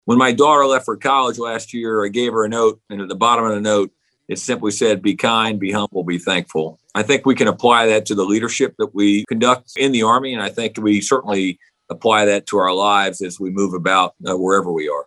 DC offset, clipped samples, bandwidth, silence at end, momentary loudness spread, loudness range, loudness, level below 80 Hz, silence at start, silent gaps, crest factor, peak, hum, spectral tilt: under 0.1%; under 0.1%; 12 kHz; 0.05 s; 10 LU; 3 LU; -17 LUFS; -64 dBFS; 0.05 s; none; 18 dB; 0 dBFS; none; -4 dB/octave